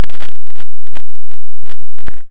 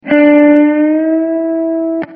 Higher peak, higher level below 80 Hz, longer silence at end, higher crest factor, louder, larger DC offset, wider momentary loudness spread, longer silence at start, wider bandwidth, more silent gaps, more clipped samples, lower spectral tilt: about the same, 0 dBFS vs 0 dBFS; first, -40 dBFS vs -62 dBFS; about the same, 0 s vs 0 s; about the same, 14 dB vs 10 dB; second, -36 LUFS vs -10 LUFS; first, 100% vs under 0.1%; first, 13 LU vs 8 LU; about the same, 0 s vs 0.05 s; first, 10 kHz vs 3.5 kHz; neither; first, 80% vs under 0.1%; second, -6.5 dB/octave vs -8.5 dB/octave